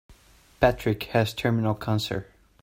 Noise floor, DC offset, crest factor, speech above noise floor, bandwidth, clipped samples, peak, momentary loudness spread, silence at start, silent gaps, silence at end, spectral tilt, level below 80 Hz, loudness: -55 dBFS; under 0.1%; 24 dB; 30 dB; 16.5 kHz; under 0.1%; -4 dBFS; 6 LU; 0.1 s; none; 0.4 s; -6.5 dB/octave; -46 dBFS; -26 LUFS